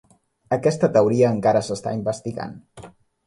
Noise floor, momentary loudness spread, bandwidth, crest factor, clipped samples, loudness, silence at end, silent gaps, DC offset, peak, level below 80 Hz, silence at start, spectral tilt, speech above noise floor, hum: -45 dBFS; 15 LU; 11.5 kHz; 18 dB; under 0.1%; -21 LUFS; 0.35 s; none; under 0.1%; -4 dBFS; -58 dBFS; 0.5 s; -6.5 dB/octave; 25 dB; none